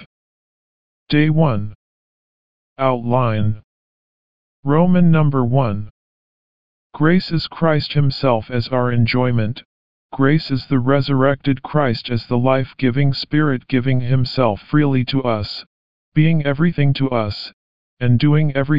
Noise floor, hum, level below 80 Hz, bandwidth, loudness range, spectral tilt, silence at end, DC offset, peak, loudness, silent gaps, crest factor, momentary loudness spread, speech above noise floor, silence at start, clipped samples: under -90 dBFS; none; -46 dBFS; 5.4 kHz; 2 LU; -6.5 dB/octave; 0 s; 3%; -2 dBFS; -18 LUFS; 0.06-1.07 s, 1.75-2.76 s, 3.64-4.63 s, 5.90-6.90 s, 9.65-10.09 s, 15.66-16.12 s, 17.53-17.97 s; 16 dB; 8 LU; over 74 dB; 0 s; under 0.1%